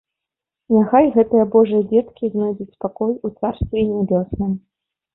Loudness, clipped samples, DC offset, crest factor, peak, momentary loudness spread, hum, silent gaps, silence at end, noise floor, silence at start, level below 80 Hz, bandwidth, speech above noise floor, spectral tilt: -18 LUFS; under 0.1%; under 0.1%; 16 dB; -2 dBFS; 10 LU; none; none; 0.55 s; -85 dBFS; 0.7 s; -42 dBFS; 4 kHz; 68 dB; -13 dB/octave